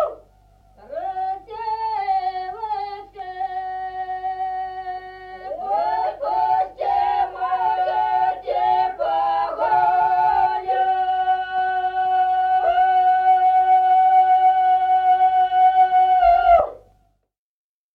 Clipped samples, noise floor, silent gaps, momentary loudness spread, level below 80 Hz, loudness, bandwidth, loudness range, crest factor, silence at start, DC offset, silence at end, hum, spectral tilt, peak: under 0.1%; -71 dBFS; none; 14 LU; -50 dBFS; -19 LUFS; 4.9 kHz; 11 LU; 14 dB; 0 s; under 0.1%; 1.2 s; none; -5 dB/octave; -6 dBFS